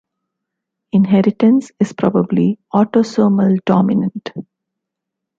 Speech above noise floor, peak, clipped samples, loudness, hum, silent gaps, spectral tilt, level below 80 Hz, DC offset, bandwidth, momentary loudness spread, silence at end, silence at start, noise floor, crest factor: 66 dB; -2 dBFS; under 0.1%; -15 LUFS; none; none; -8.5 dB/octave; -58 dBFS; under 0.1%; 7.6 kHz; 9 LU; 0.95 s; 0.95 s; -80 dBFS; 14 dB